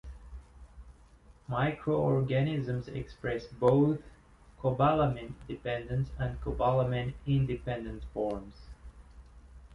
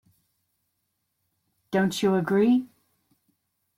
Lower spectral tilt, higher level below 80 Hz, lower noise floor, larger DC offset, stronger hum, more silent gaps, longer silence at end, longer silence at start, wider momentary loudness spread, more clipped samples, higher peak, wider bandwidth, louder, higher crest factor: first, -9 dB/octave vs -6 dB/octave; first, -48 dBFS vs -68 dBFS; second, -58 dBFS vs -78 dBFS; neither; neither; neither; second, 0 s vs 1.1 s; second, 0.05 s vs 1.7 s; first, 15 LU vs 7 LU; neither; about the same, -12 dBFS vs -12 dBFS; second, 6.4 kHz vs 15.5 kHz; second, -31 LUFS vs -24 LUFS; about the same, 20 dB vs 16 dB